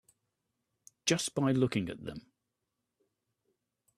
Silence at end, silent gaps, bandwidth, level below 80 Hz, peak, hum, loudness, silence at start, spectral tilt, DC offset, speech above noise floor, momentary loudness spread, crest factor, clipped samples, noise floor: 1.75 s; none; 13.5 kHz; -68 dBFS; -14 dBFS; none; -32 LUFS; 1.05 s; -4.5 dB/octave; under 0.1%; 54 dB; 16 LU; 22 dB; under 0.1%; -86 dBFS